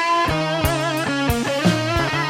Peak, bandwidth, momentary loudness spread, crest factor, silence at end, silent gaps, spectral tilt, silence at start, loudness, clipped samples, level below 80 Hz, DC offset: -4 dBFS; 17 kHz; 2 LU; 16 dB; 0 s; none; -5 dB/octave; 0 s; -20 LUFS; under 0.1%; -34 dBFS; under 0.1%